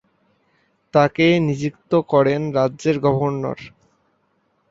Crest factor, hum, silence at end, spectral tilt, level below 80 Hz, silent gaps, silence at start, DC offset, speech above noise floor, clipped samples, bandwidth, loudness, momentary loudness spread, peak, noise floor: 20 dB; none; 1.05 s; -7 dB/octave; -58 dBFS; none; 0.95 s; under 0.1%; 48 dB; under 0.1%; 7.8 kHz; -19 LUFS; 10 LU; -2 dBFS; -66 dBFS